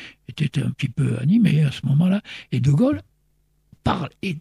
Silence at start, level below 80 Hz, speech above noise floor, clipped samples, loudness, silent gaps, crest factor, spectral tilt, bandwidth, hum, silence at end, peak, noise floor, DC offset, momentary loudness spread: 0 s; -50 dBFS; 45 dB; under 0.1%; -21 LUFS; none; 14 dB; -8 dB/octave; 11.5 kHz; none; 0 s; -6 dBFS; -65 dBFS; under 0.1%; 10 LU